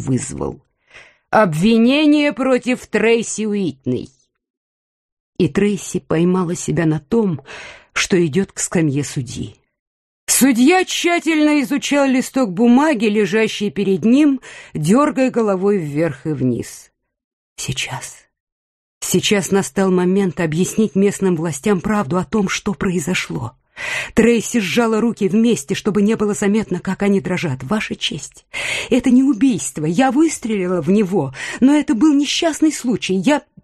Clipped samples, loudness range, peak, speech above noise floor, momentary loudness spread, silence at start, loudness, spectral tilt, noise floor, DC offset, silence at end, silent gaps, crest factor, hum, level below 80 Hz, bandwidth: under 0.1%; 5 LU; -2 dBFS; 29 dB; 11 LU; 0 s; -17 LUFS; -5 dB/octave; -46 dBFS; under 0.1%; 0.25 s; 4.50-5.33 s, 9.79-10.27 s, 17.24-17.56 s, 18.40-19.01 s; 16 dB; none; -48 dBFS; 13.5 kHz